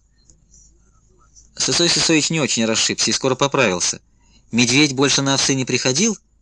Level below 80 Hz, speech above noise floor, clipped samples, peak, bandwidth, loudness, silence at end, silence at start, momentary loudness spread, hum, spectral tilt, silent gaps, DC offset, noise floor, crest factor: -52 dBFS; 36 dB; under 0.1%; -2 dBFS; 11 kHz; -16 LUFS; 0.25 s; 1.55 s; 6 LU; none; -2.5 dB/octave; none; under 0.1%; -54 dBFS; 18 dB